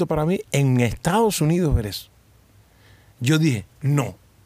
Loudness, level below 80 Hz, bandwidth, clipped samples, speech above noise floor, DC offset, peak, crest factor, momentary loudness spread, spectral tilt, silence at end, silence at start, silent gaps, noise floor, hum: -21 LUFS; -38 dBFS; 15.5 kHz; under 0.1%; 34 dB; under 0.1%; -6 dBFS; 16 dB; 8 LU; -6 dB/octave; 0.3 s; 0 s; none; -54 dBFS; none